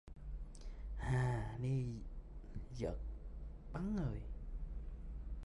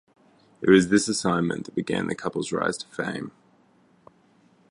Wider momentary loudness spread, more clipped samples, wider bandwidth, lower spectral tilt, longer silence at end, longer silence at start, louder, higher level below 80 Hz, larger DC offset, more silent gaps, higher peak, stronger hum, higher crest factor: about the same, 14 LU vs 12 LU; neither; about the same, 11.5 kHz vs 11.5 kHz; first, -8 dB/octave vs -5 dB/octave; second, 0 s vs 1.4 s; second, 0.05 s vs 0.6 s; second, -44 LUFS vs -24 LUFS; first, -48 dBFS vs -58 dBFS; neither; neither; second, -26 dBFS vs -4 dBFS; neither; second, 16 dB vs 22 dB